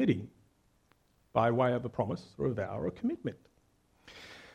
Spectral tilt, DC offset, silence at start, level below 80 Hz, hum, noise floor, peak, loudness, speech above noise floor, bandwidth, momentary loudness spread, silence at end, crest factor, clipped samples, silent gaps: -8 dB/octave; under 0.1%; 0 s; -64 dBFS; none; -69 dBFS; -12 dBFS; -33 LUFS; 38 dB; 10.5 kHz; 21 LU; 0.05 s; 22 dB; under 0.1%; none